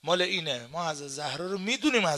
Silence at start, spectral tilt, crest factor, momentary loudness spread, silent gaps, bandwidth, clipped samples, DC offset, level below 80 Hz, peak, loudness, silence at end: 0.05 s; -3.5 dB/octave; 18 dB; 8 LU; none; 13.5 kHz; under 0.1%; under 0.1%; -68 dBFS; -12 dBFS; -29 LUFS; 0 s